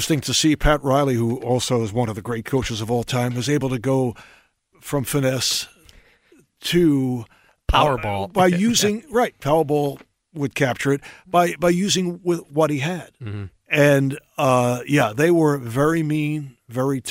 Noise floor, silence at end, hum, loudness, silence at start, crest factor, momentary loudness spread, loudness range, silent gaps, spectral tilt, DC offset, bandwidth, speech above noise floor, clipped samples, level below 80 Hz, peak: -56 dBFS; 0 s; none; -20 LUFS; 0 s; 18 dB; 10 LU; 4 LU; none; -5 dB/octave; under 0.1%; 16 kHz; 36 dB; under 0.1%; -38 dBFS; -2 dBFS